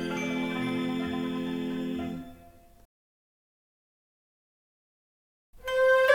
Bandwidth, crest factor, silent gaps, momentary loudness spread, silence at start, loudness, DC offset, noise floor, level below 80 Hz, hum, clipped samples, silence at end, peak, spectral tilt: 17 kHz; 22 dB; 2.85-5.53 s; 14 LU; 0 s; -30 LUFS; under 0.1%; -54 dBFS; -60 dBFS; none; under 0.1%; 0 s; -8 dBFS; -5.5 dB/octave